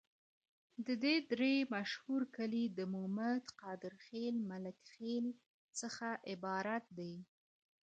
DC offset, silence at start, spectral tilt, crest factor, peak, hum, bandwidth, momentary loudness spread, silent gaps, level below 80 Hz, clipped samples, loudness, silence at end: under 0.1%; 0.8 s; -4.5 dB/octave; 18 dB; -22 dBFS; none; 9 kHz; 14 LU; 5.46-5.68 s; -86 dBFS; under 0.1%; -41 LUFS; 0.6 s